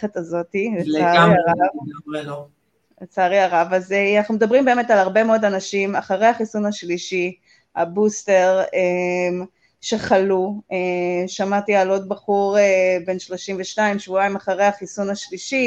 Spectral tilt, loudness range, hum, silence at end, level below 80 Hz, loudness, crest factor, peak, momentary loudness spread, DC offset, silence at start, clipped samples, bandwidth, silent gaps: -5 dB/octave; 3 LU; none; 0 s; -62 dBFS; -19 LUFS; 18 dB; -2 dBFS; 11 LU; under 0.1%; 0 s; under 0.1%; 8.6 kHz; none